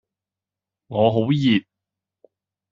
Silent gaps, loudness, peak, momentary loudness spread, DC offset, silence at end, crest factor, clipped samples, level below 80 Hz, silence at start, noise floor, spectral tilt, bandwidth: none; -20 LUFS; -4 dBFS; 5 LU; under 0.1%; 1.1 s; 20 dB; under 0.1%; -62 dBFS; 0.9 s; -89 dBFS; -5.5 dB/octave; 7.4 kHz